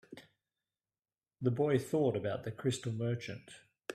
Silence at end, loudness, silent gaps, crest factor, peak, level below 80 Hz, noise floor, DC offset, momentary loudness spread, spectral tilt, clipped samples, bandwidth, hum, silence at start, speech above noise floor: 0 s; -35 LUFS; none; 20 dB; -18 dBFS; -72 dBFS; under -90 dBFS; under 0.1%; 20 LU; -6.5 dB/octave; under 0.1%; 14.5 kHz; none; 0.1 s; over 56 dB